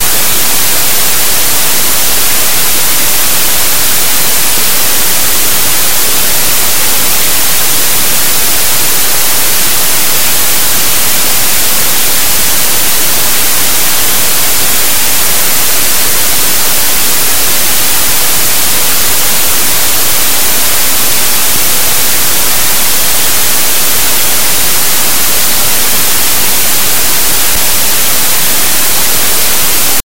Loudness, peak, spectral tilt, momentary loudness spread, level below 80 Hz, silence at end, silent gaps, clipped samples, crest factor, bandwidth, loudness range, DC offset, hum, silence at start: -7 LUFS; 0 dBFS; 0 dB/octave; 0 LU; -32 dBFS; 0.05 s; none; 3%; 12 dB; over 20 kHz; 0 LU; 40%; none; 0 s